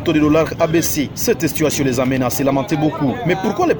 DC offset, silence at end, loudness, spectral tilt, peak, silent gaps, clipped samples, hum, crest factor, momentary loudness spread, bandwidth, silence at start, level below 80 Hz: under 0.1%; 0 s; -17 LUFS; -5 dB/octave; -2 dBFS; none; under 0.1%; none; 14 dB; 4 LU; over 20 kHz; 0 s; -40 dBFS